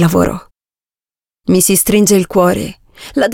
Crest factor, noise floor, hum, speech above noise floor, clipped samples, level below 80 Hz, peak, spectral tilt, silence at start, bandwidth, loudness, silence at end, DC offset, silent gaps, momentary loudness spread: 14 dB; under -90 dBFS; none; over 78 dB; under 0.1%; -38 dBFS; 0 dBFS; -4.5 dB/octave; 0 s; 17 kHz; -12 LUFS; 0 s; under 0.1%; none; 15 LU